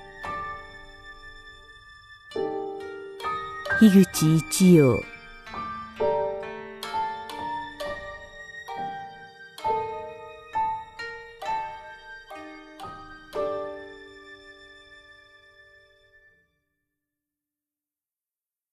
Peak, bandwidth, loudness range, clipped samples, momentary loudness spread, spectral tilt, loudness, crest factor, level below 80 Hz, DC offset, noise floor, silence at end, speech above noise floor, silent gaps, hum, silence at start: -6 dBFS; 14 kHz; 16 LU; under 0.1%; 26 LU; -6 dB/octave; -26 LUFS; 22 dB; -54 dBFS; under 0.1%; under -90 dBFS; 3.75 s; over 73 dB; none; none; 0 s